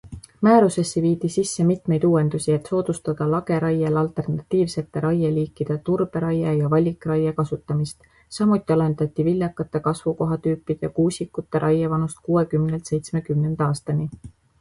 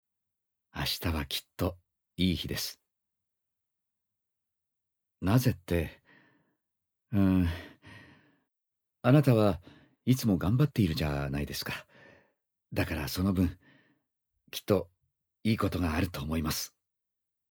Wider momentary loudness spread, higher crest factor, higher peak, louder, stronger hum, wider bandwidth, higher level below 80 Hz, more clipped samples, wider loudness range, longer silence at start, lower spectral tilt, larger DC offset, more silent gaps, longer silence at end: second, 7 LU vs 13 LU; about the same, 18 dB vs 22 dB; first, -4 dBFS vs -10 dBFS; first, -22 LUFS vs -30 LUFS; neither; second, 11.5 kHz vs over 20 kHz; about the same, -52 dBFS vs -48 dBFS; neither; second, 2 LU vs 7 LU; second, 0.05 s vs 0.75 s; first, -7.5 dB/octave vs -6 dB/octave; neither; neither; second, 0.3 s vs 0.85 s